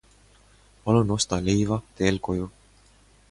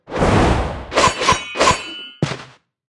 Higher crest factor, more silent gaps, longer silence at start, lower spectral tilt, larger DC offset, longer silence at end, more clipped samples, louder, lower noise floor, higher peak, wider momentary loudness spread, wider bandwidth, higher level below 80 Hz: about the same, 20 dB vs 18 dB; neither; first, 0.85 s vs 0.1 s; first, -5.5 dB/octave vs -4 dB/octave; neither; first, 0.8 s vs 0.45 s; neither; second, -25 LUFS vs -17 LUFS; first, -57 dBFS vs -42 dBFS; second, -6 dBFS vs 0 dBFS; about the same, 9 LU vs 10 LU; about the same, 11.5 kHz vs 12 kHz; second, -46 dBFS vs -30 dBFS